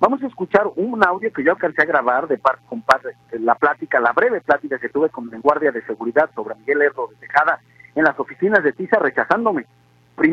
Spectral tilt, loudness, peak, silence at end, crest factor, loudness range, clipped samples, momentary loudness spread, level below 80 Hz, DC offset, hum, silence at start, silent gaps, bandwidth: -6.5 dB/octave; -19 LUFS; 0 dBFS; 0 s; 18 dB; 2 LU; under 0.1%; 7 LU; -60 dBFS; under 0.1%; none; 0 s; none; 10.5 kHz